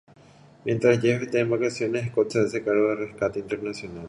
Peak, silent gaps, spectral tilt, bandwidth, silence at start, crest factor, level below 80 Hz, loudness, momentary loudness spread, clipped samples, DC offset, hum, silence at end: -6 dBFS; none; -6.5 dB/octave; 11.5 kHz; 0.65 s; 18 dB; -60 dBFS; -25 LUFS; 10 LU; under 0.1%; under 0.1%; none; 0 s